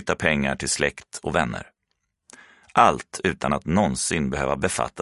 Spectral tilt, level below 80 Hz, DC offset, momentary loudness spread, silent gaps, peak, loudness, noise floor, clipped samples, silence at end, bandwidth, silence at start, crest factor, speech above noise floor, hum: -4 dB/octave; -44 dBFS; under 0.1%; 8 LU; none; 0 dBFS; -23 LUFS; -76 dBFS; under 0.1%; 0 s; 11.5 kHz; 0 s; 24 dB; 53 dB; none